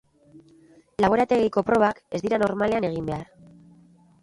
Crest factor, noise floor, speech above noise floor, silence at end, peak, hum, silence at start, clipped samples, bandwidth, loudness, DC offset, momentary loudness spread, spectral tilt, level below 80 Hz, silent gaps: 20 dB; -55 dBFS; 32 dB; 1 s; -6 dBFS; none; 0.35 s; under 0.1%; 11.5 kHz; -23 LUFS; under 0.1%; 11 LU; -7 dB/octave; -54 dBFS; none